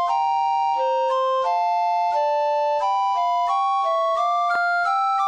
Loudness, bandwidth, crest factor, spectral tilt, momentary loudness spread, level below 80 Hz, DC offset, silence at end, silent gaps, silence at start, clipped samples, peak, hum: -21 LUFS; 9.4 kHz; 10 dB; 0 dB/octave; 1 LU; -70 dBFS; under 0.1%; 0 s; none; 0 s; under 0.1%; -12 dBFS; 50 Hz at -75 dBFS